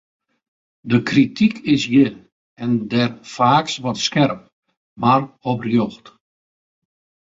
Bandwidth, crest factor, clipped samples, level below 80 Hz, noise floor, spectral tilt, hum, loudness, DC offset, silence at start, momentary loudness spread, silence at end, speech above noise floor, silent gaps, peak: 7.8 kHz; 18 dB; under 0.1%; -58 dBFS; under -90 dBFS; -5.5 dB/octave; none; -18 LUFS; under 0.1%; 0.85 s; 8 LU; 1.25 s; over 72 dB; 2.32-2.56 s, 4.53-4.62 s, 4.77-4.96 s; -2 dBFS